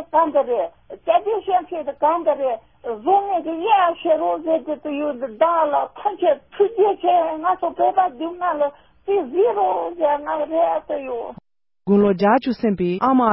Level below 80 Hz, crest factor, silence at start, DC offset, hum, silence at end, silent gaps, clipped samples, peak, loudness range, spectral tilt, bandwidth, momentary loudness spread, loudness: -58 dBFS; 16 dB; 0 s; 0.1%; none; 0 s; none; under 0.1%; -4 dBFS; 2 LU; -11 dB/octave; 5.8 kHz; 9 LU; -20 LUFS